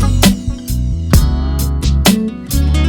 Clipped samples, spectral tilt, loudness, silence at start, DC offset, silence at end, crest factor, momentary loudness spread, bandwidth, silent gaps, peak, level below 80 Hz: under 0.1%; -5 dB/octave; -14 LUFS; 0 s; under 0.1%; 0 s; 12 dB; 8 LU; over 20 kHz; none; 0 dBFS; -16 dBFS